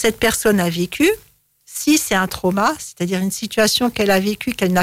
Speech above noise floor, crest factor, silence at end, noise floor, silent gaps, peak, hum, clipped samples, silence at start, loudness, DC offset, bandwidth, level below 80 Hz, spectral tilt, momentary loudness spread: 29 dB; 14 dB; 0 s; -46 dBFS; none; -4 dBFS; none; under 0.1%; 0 s; -18 LUFS; under 0.1%; 16.5 kHz; -44 dBFS; -4 dB/octave; 7 LU